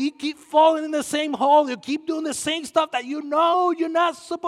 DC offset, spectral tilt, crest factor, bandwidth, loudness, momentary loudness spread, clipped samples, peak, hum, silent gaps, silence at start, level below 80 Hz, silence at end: under 0.1%; -2.5 dB/octave; 16 dB; 14.5 kHz; -21 LUFS; 9 LU; under 0.1%; -6 dBFS; none; none; 0 s; -70 dBFS; 0 s